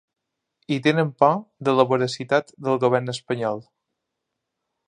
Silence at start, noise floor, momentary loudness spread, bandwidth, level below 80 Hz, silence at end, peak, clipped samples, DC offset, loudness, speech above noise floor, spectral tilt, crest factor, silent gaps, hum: 0.7 s; -81 dBFS; 9 LU; 10.5 kHz; -70 dBFS; 1.25 s; -2 dBFS; under 0.1%; under 0.1%; -22 LUFS; 60 dB; -6 dB/octave; 22 dB; none; none